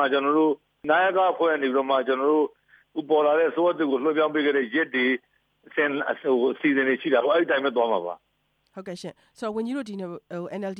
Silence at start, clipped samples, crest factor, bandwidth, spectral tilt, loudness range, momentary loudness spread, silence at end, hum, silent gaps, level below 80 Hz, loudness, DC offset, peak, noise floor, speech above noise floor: 0 s; under 0.1%; 16 dB; 9.8 kHz; -6 dB/octave; 3 LU; 14 LU; 0 s; none; none; -76 dBFS; -23 LUFS; under 0.1%; -8 dBFS; -71 dBFS; 47 dB